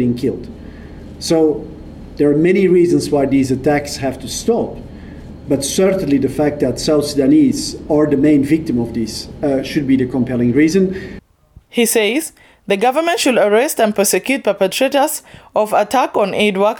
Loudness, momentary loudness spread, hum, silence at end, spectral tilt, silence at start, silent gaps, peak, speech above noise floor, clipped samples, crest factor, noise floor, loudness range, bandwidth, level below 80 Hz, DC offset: -15 LUFS; 16 LU; none; 0 s; -5 dB/octave; 0 s; none; -4 dBFS; 32 dB; under 0.1%; 12 dB; -47 dBFS; 3 LU; 19.5 kHz; -40 dBFS; under 0.1%